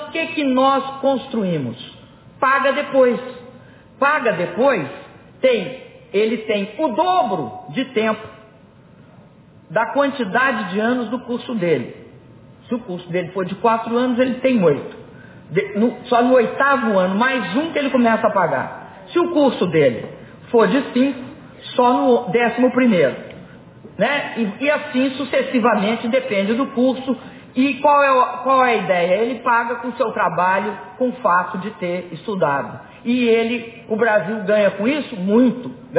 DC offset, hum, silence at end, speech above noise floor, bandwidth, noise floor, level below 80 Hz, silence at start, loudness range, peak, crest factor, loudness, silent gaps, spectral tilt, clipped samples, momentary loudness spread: under 0.1%; none; 0 s; 29 dB; 4 kHz; -46 dBFS; -60 dBFS; 0 s; 5 LU; -4 dBFS; 16 dB; -18 LUFS; none; -10 dB/octave; under 0.1%; 11 LU